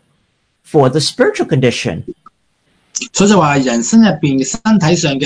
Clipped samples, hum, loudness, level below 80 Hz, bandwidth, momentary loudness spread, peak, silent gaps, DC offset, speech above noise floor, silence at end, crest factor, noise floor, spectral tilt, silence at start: 0.2%; none; -12 LUFS; -46 dBFS; 10.5 kHz; 12 LU; 0 dBFS; none; under 0.1%; 50 dB; 0 s; 14 dB; -61 dBFS; -5 dB/octave; 0.75 s